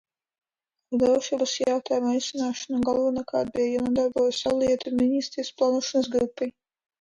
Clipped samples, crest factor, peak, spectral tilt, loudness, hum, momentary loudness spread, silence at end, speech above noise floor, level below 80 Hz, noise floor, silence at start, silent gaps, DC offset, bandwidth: under 0.1%; 14 dB; -10 dBFS; -4 dB/octave; -25 LUFS; none; 6 LU; 0.5 s; 63 dB; -58 dBFS; -87 dBFS; 0.9 s; none; under 0.1%; 10 kHz